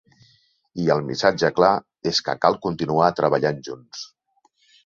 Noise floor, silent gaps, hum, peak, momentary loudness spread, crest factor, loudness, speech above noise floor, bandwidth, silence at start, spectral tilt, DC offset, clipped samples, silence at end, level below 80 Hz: -65 dBFS; none; none; -2 dBFS; 17 LU; 20 dB; -21 LUFS; 44 dB; 7.6 kHz; 0.75 s; -5 dB/octave; under 0.1%; under 0.1%; 0.8 s; -58 dBFS